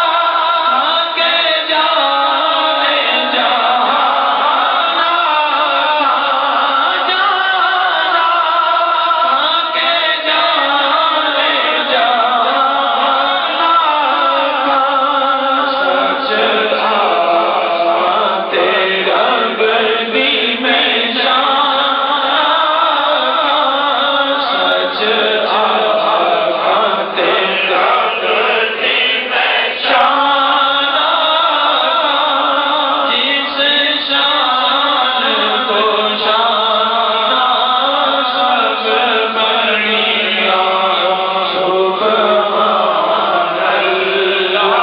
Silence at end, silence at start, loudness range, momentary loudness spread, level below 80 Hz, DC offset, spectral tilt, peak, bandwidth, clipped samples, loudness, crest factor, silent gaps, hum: 0 s; 0 s; 1 LU; 2 LU; -60 dBFS; under 0.1%; -6 dB/octave; 0 dBFS; 5.6 kHz; under 0.1%; -12 LUFS; 12 dB; none; none